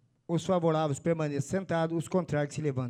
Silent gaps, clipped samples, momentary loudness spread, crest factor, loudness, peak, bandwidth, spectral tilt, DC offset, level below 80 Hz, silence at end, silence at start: none; under 0.1%; 5 LU; 14 dB; -30 LUFS; -14 dBFS; 14 kHz; -6.5 dB/octave; under 0.1%; -64 dBFS; 0 s; 0.3 s